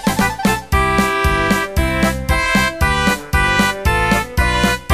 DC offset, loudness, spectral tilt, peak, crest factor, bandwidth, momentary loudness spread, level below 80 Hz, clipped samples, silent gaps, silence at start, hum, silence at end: under 0.1%; -15 LUFS; -4.5 dB/octave; -2 dBFS; 14 dB; 15.5 kHz; 2 LU; -24 dBFS; under 0.1%; none; 0 s; none; 0 s